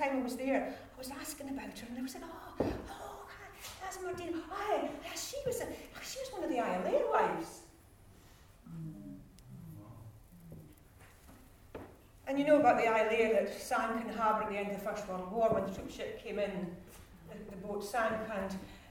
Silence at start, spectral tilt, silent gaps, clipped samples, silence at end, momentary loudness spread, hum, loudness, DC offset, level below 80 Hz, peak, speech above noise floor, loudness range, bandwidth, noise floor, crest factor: 0 s; -5 dB/octave; none; under 0.1%; 0 s; 22 LU; none; -35 LUFS; under 0.1%; -60 dBFS; -14 dBFS; 24 dB; 20 LU; over 20 kHz; -59 dBFS; 22 dB